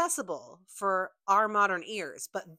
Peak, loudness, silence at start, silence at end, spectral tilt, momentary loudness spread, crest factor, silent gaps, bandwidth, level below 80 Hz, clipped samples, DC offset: -12 dBFS; -29 LUFS; 0 s; 0.05 s; -2.5 dB/octave; 13 LU; 18 dB; none; 16 kHz; -80 dBFS; under 0.1%; under 0.1%